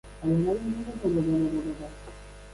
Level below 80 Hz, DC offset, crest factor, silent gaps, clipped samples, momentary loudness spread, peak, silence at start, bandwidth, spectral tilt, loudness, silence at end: -46 dBFS; under 0.1%; 12 dB; none; under 0.1%; 19 LU; -16 dBFS; 0.05 s; 11.5 kHz; -8.5 dB/octave; -28 LUFS; 0 s